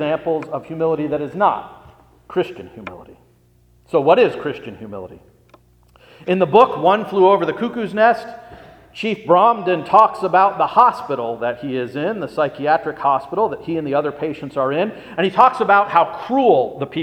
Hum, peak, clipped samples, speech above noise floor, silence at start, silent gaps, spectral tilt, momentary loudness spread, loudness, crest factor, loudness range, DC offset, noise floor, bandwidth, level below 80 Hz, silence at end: none; 0 dBFS; under 0.1%; 37 dB; 0 s; none; -7 dB/octave; 14 LU; -17 LUFS; 18 dB; 6 LU; under 0.1%; -54 dBFS; 10 kHz; -58 dBFS; 0 s